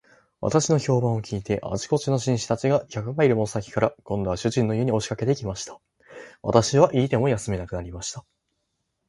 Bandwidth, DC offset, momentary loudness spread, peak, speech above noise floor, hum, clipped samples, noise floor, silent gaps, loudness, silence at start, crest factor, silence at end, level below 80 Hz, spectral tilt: 11.5 kHz; under 0.1%; 13 LU; 0 dBFS; 53 dB; none; under 0.1%; -76 dBFS; none; -24 LUFS; 0.4 s; 24 dB; 0.9 s; -48 dBFS; -6 dB/octave